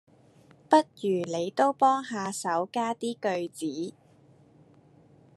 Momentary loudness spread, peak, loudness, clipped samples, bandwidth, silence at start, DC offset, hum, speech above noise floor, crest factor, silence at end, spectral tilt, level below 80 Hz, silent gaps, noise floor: 11 LU; -6 dBFS; -28 LUFS; under 0.1%; 13 kHz; 0.7 s; under 0.1%; none; 31 dB; 24 dB; 1.45 s; -4.5 dB/octave; -80 dBFS; none; -58 dBFS